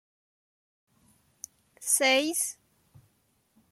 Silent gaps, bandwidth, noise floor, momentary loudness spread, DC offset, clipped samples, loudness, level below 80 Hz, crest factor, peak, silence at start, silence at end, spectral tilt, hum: none; 16 kHz; -71 dBFS; 24 LU; under 0.1%; under 0.1%; -25 LUFS; -80 dBFS; 22 dB; -12 dBFS; 1.8 s; 1.2 s; 0 dB/octave; none